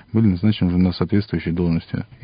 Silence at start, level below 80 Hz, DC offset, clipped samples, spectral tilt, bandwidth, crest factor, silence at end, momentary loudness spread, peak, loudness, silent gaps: 0.15 s; -36 dBFS; under 0.1%; under 0.1%; -13 dB/octave; 5.2 kHz; 16 dB; 0.2 s; 6 LU; -4 dBFS; -20 LUFS; none